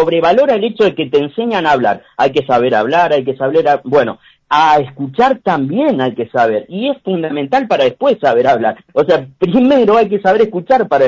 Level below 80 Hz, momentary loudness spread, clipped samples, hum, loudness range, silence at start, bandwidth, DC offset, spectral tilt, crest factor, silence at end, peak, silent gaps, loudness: -52 dBFS; 6 LU; under 0.1%; none; 2 LU; 0 s; 7.6 kHz; under 0.1%; -6.5 dB/octave; 12 dB; 0 s; 0 dBFS; none; -13 LUFS